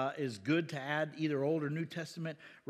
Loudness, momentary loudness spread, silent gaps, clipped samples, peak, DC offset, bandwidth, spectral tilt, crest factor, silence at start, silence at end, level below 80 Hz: -36 LUFS; 8 LU; none; under 0.1%; -20 dBFS; under 0.1%; 13.5 kHz; -6.5 dB/octave; 16 dB; 0 s; 0.1 s; -88 dBFS